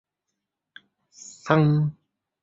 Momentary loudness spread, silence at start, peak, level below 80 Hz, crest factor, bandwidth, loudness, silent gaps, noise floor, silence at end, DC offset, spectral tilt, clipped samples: 24 LU; 1.45 s; -4 dBFS; -62 dBFS; 24 dB; 7.8 kHz; -22 LUFS; none; -83 dBFS; 0.5 s; under 0.1%; -7.5 dB/octave; under 0.1%